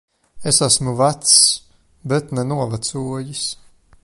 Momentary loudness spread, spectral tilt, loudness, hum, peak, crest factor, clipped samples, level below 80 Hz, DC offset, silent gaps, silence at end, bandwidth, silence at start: 15 LU; -3 dB/octave; -16 LUFS; none; 0 dBFS; 20 dB; under 0.1%; -52 dBFS; under 0.1%; none; 0.5 s; 12 kHz; 0.35 s